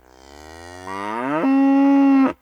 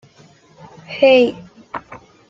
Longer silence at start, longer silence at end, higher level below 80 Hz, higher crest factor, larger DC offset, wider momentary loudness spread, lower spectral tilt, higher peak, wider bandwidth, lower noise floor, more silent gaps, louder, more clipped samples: second, 0.4 s vs 0.9 s; second, 0.1 s vs 0.35 s; about the same, -56 dBFS vs -60 dBFS; second, 12 dB vs 18 dB; neither; about the same, 19 LU vs 21 LU; first, -6.5 dB/octave vs -5 dB/octave; second, -6 dBFS vs -2 dBFS; first, 8.4 kHz vs 7.2 kHz; second, -44 dBFS vs -49 dBFS; neither; second, -17 LUFS vs -14 LUFS; neither